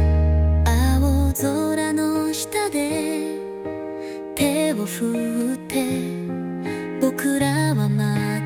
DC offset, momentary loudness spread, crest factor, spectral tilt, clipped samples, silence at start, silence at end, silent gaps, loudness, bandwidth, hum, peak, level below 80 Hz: under 0.1%; 10 LU; 14 dB; -6 dB/octave; under 0.1%; 0 s; 0 s; none; -22 LUFS; 17 kHz; none; -6 dBFS; -30 dBFS